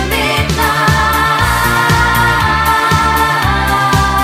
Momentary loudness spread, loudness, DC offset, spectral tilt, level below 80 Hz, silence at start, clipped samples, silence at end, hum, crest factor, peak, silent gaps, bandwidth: 2 LU; -11 LUFS; under 0.1%; -4 dB/octave; -22 dBFS; 0 s; under 0.1%; 0 s; none; 12 dB; 0 dBFS; none; 16.5 kHz